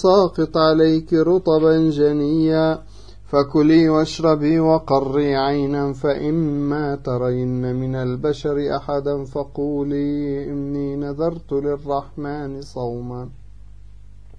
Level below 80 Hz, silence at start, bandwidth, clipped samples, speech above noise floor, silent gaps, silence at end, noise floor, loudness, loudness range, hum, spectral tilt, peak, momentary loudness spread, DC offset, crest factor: -44 dBFS; 0 s; 8 kHz; under 0.1%; 24 dB; none; 0 s; -43 dBFS; -19 LUFS; 8 LU; 50 Hz at -45 dBFS; -7.5 dB/octave; -2 dBFS; 12 LU; 0.9%; 16 dB